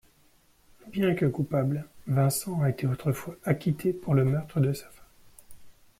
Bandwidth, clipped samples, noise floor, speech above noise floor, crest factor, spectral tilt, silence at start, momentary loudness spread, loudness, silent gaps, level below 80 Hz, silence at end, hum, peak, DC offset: 16 kHz; under 0.1%; -62 dBFS; 35 dB; 18 dB; -7 dB/octave; 0.85 s; 6 LU; -28 LUFS; none; -58 dBFS; 0.3 s; none; -12 dBFS; under 0.1%